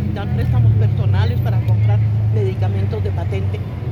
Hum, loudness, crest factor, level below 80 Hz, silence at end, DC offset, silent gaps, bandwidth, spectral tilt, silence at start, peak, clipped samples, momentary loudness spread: none; -18 LUFS; 10 dB; -34 dBFS; 0 s; under 0.1%; none; 4.7 kHz; -9.5 dB/octave; 0 s; -6 dBFS; under 0.1%; 6 LU